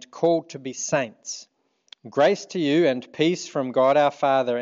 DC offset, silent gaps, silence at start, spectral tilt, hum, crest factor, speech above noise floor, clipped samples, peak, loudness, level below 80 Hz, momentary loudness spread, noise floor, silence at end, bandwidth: under 0.1%; none; 0.15 s; -4.5 dB/octave; none; 16 dB; 31 dB; under 0.1%; -6 dBFS; -22 LUFS; -76 dBFS; 12 LU; -53 dBFS; 0 s; 7.8 kHz